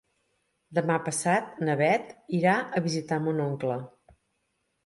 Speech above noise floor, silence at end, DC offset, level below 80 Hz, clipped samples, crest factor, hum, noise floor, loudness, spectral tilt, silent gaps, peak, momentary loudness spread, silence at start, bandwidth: 50 dB; 1 s; under 0.1%; -70 dBFS; under 0.1%; 18 dB; none; -76 dBFS; -27 LUFS; -5.5 dB/octave; none; -10 dBFS; 8 LU; 0.7 s; 11.5 kHz